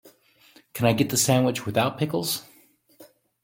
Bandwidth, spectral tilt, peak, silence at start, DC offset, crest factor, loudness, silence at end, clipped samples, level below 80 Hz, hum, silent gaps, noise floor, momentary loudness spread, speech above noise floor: 17 kHz; -4.5 dB/octave; -4 dBFS; 0.05 s; under 0.1%; 22 dB; -23 LUFS; 0.4 s; under 0.1%; -60 dBFS; none; none; -58 dBFS; 9 LU; 35 dB